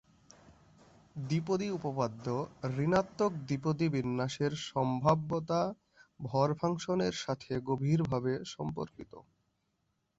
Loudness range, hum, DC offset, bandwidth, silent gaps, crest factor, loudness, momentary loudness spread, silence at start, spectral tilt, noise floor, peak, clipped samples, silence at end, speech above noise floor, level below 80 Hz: 3 LU; none; under 0.1%; 8 kHz; none; 22 dB; -33 LUFS; 9 LU; 0.45 s; -6.5 dB/octave; -79 dBFS; -12 dBFS; under 0.1%; 0.95 s; 47 dB; -64 dBFS